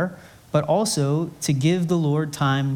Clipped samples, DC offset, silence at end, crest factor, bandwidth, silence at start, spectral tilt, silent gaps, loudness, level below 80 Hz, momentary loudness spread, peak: under 0.1%; under 0.1%; 0 s; 16 dB; 18 kHz; 0 s; -5.5 dB/octave; none; -22 LUFS; -60 dBFS; 4 LU; -6 dBFS